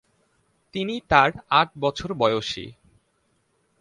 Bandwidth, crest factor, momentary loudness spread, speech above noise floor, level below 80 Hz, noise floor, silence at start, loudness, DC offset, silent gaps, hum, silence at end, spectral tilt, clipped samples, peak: 11 kHz; 24 dB; 15 LU; 46 dB; -50 dBFS; -69 dBFS; 0.75 s; -22 LUFS; under 0.1%; none; none; 1.1 s; -5 dB/octave; under 0.1%; -2 dBFS